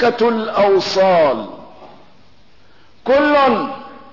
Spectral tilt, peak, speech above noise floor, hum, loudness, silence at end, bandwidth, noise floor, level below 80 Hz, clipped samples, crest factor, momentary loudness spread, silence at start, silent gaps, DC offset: -5 dB/octave; -6 dBFS; 37 dB; none; -15 LUFS; 0.15 s; 6 kHz; -51 dBFS; -54 dBFS; under 0.1%; 12 dB; 15 LU; 0 s; none; 0.7%